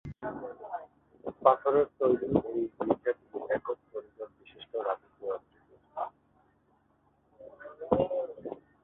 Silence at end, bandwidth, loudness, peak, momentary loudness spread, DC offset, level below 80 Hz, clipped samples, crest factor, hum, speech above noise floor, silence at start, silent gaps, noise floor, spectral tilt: 0.3 s; 4 kHz; -32 LUFS; -6 dBFS; 19 LU; under 0.1%; -62 dBFS; under 0.1%; 26 dB; none; 42 dB; 0.05 s; none; -69 dBFS; -10 dB/octave